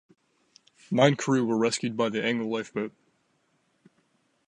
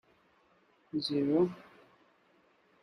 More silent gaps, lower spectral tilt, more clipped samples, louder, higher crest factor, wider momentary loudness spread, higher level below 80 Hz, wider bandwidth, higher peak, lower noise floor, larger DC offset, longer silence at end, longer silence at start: neither; second, -5 dB/octave vs -7 dB/octave; neither; first, -26 LUFS vs -32 LUFS; about the same, 22 dB vs 20 dB; about the same, 11 LU vs 12 LU; about the same, -74 dBFS vs -74 dBFS; about the same, 11 kHz vs 10.5 kHz; first, -6 dBFS vs -18 dBFS; about the same, -71 dBFS vs -68 dBFS; neither; first, 1.6 s vs 1.2 s; about the same, 0.9 s vs 0.95 s